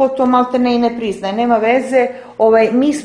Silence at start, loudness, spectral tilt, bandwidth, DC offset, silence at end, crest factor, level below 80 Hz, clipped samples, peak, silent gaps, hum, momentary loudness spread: 0 s; -14 LUFS; -5.5 dB/octave; 10.5 kHz; under 0.1%; 0 s; 14 dB; -52 dBFS; under 0.1%; 0 dBFS; none; none; 7 LU